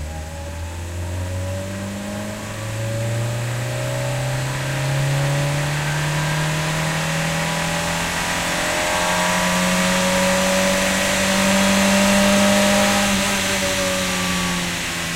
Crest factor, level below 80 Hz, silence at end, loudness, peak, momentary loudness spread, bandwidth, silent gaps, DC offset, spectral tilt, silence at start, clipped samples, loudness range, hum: 16 dB; -38 dBFS; 0 s; -19 LUFS; -4 dBFS; 12 LU; 16 kHz; none; under 0.1%; -3.5 dB/octave; 0 s; under 0.1%; 9 LU; none